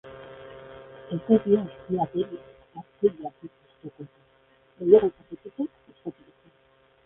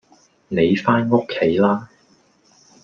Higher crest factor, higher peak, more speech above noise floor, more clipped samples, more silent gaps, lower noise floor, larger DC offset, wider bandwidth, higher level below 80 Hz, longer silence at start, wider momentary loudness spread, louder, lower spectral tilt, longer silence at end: first, 24 dB vs 18 dB; about the same, -4 dBFS vs -2 dBFS; about the same, 36 dB vs 39 dB; neither; neither; first, -62 dBFS vs -57 dBFS; neither; second, 3.8 kHz vs 7.2 kHz; about the same, -62 dBFS vs -58 dBFS; second, 0.05 s vs 0.5 s; first, 27 LU vs 6 LU; second, -25 LUFS vs -18 LUFS; first, -11.5 dB/octave vs -7.5 dB/octave; about the same, 0.95 s vs 1 s